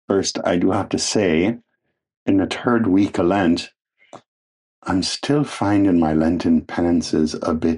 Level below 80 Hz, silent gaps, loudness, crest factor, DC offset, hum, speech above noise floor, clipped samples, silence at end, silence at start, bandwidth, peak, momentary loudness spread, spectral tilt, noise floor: -46 dBFS; 2.17-2.26 s, 4.28-4.82 s; -19 LUFS; 16 dB; under 0.1%; none; 55 dB; under 0.1%; 0 s; 0.1 s; 11 kHz; -4 dBFS; 6 LU; -5 dB/octave; -73 dBFS